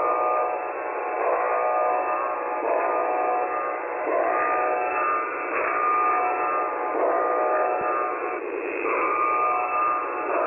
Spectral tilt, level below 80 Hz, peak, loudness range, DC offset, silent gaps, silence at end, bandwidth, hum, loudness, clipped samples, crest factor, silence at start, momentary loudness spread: -8 dB/octave; -66 dBFS; -12 dBFS; 1 LU; under 0.1%; none; 0 s; 3.2 kHz; none; -24 LUFS; under 0.1%; 12 dB; 0 s; 5 LU